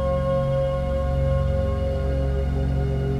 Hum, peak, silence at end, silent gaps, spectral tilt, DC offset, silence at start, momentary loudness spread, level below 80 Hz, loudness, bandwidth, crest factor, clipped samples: none; -12 dBFS; 0 s; none; -9 dB/octave; under 0.1%; 0 s; 2 LU; -26 dBFS; -24 LUFS; 6.8 kHz; 10 dB; under 0.1%